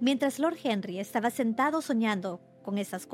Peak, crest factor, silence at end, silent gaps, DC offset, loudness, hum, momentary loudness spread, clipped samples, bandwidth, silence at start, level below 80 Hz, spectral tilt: -14 dBFS; 16 dB; 0 s; none; under 0.1%; -30 LUFS; none; 7 LU; under 0.1%; 16.5 kHz; 0 s; -80 dBFS; -5 dB/octave